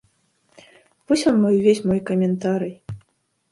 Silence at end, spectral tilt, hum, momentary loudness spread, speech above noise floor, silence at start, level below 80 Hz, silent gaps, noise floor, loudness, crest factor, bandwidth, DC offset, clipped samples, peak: 0.55 s; -6.5 dB/octave; none; 20 LU; 48 dB; 1.1 s; -58 dBFS; none; -67 dBFS; -20 LUFS; 16 dB; 11.5 kHz; under 0.1%; under 0.1%; -4 dBFS